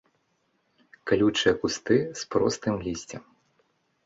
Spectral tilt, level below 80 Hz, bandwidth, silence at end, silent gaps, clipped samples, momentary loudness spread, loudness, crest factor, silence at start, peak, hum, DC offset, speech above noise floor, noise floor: -4.5 dB/octave; -56 dBFS; 8 kHz; 0.85 s; none; under 0.1%; 16 LU; -26 LUFS; 20 dB; 1.05 s; -8 dBFS; none; under 0.1%; 47 dB; -72 dBFS